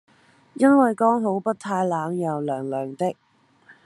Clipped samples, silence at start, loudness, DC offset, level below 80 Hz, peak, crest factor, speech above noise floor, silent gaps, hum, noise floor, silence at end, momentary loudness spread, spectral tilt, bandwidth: under 0.1%; 0.6 s; -22 LUFS; under 0.1%; -74 dBFS; -4 dBFS; 18 dB; 33 dB; none; none; -55 dBFS; 0.15 s; 11 LU; -7.5 dB/octave; 12 kHz